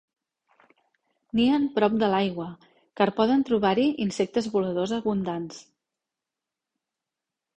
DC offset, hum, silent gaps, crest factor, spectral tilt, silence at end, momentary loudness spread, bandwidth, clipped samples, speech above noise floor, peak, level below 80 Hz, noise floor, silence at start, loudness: under 0.1%; none; none; 20 dB; -6 dB/octave; 1.95 s; 11 LU; 9.6 kHz; under 0.1%; 64 dB; -8 dBFS; -62 dBFS; -88 dBFS; 1.35 s; -25 LUFS